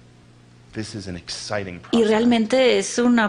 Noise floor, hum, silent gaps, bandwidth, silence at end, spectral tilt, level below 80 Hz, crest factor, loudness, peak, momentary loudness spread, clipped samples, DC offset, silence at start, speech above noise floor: -49 dBFS; none; none; 10.5 kHz; 0 s; -4 dB/octave; -54 dBFS; 14 dB; -20 LUFS; -6 dBFS; 15 LU; under 0.1%; under 0.1%; 0.75 s; 30 dB